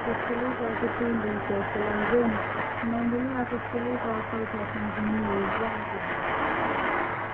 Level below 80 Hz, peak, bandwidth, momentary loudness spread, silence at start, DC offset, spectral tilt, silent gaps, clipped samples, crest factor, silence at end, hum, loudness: -50 dBFS; -12 dBFS; 4.4 kHz; 5 LU; 0 s; under 0.1%; -9 dB/octave; none; under 0.1%; 16 dB; 0 s; none; -28 LUFS